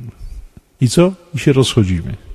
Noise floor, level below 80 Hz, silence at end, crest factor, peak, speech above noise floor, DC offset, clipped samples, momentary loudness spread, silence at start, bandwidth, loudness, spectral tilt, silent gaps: -34 dBFS; -32 dBFS; 0 s; 16 dB; 0 dBFS; 20 dB; under 0.1%; under 0.1%; 8 LU; 0 s; 14.5 kHz; -15 LUFS; -6 dB/octave; none